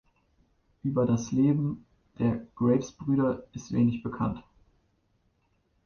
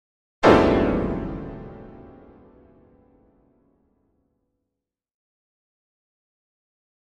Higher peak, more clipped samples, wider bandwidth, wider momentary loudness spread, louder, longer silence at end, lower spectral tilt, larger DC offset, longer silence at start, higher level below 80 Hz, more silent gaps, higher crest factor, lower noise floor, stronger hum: second, -12 dBFS vs 0 dBFS; neither; second, 7 kHz vs 11 kHz; second, 9 LU vs 26 LU; second, -28 LUFS vs -20 LUFS; second, 1.45 s vs 5 s; about the same, -8 dB/octave vs -7 dB/octave; neither; first, 0.85 s vs 0.4 s; second, -56 dBFS vs -42 dBFS; neither; second, 18 dB vs 26 dB; second, -71 dBFS vs -85 dBFS; neither